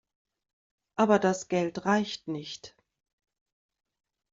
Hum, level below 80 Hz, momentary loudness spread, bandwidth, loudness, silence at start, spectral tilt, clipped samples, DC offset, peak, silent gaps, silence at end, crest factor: none; -70 dBFS; 16 LU; 7.8 kHz; -28 LUFS; 1 s; -4.5 dB/octave; under 0.1%; under 0.1%; -10 dBFS; none; 1.65 s; 22 dB